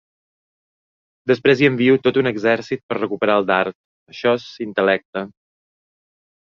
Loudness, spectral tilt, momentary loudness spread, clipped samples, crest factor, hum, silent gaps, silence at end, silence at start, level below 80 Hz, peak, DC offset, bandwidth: -18 LUFS; -6.5 dB/octave; 14 LU; under 0.1%; 18 dB; none; 2.83-2.89 s, 3.75-4.06 s, 5.05-5.13 s; 1.2 s; 1.25 s; -62 dBFS; -2 dBFS; under 0.1%; 7 kHz